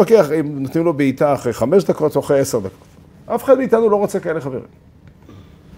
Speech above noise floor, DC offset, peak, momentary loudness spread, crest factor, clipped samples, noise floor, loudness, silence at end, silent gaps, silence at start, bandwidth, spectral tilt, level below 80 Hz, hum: 26 dB; under 0.1%; 0 dBFS; 11 LU; 16 dB; under 0.1%; -42 dBFS; -17 LUFS; 0.35 s; none; 0 s; 16 kHz; -6.5 dB/octave; -52 dBFS; none